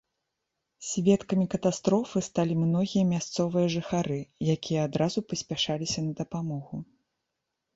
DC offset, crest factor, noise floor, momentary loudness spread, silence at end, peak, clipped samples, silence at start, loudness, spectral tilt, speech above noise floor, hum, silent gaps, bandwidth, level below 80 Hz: under 0.1%; 18 dB; -83 dBFS; 8 LU; 0.9 s; -10 dBFS; under 0.1%; 0.8 s; -28 LUFS; -5.5 dB/octave; 56 dB; none; none; 8 kHz; -60 dBFS